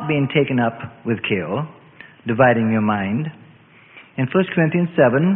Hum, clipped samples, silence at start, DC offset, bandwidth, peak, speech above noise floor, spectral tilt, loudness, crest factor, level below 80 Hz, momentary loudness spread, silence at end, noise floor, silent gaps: none; under 0.1%; 0 s; under 0.1%; 3.9 kHz; -2 dBFS; 30 dB; -12 dB/octave; -19 LUFS; 18 dB; -56 dBFS; 14 LU; 0 s; -48 dBFS; none